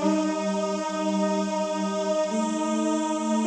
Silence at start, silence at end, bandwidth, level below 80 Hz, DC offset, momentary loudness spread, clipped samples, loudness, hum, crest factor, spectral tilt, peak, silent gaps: 0 s; 0 s; 10.5 kHz; -68 dBFS; under 0.1%; 2 LU; under 0.1%; -26 LUFS; none; 14 dB; -5 dB/octave; -12 dBFS; none